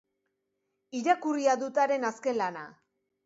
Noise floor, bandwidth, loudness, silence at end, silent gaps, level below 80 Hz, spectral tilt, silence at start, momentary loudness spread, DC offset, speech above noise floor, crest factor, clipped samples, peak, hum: -81 dBFS; 8 kHz; -29 LUFS; 0.55 s; none; -84 dBFS; -4 dB/octave; 0.95 s; 13 LU; under 0.1%; 53 dB; 18 dB; under 0.1%; -12 dBFS; none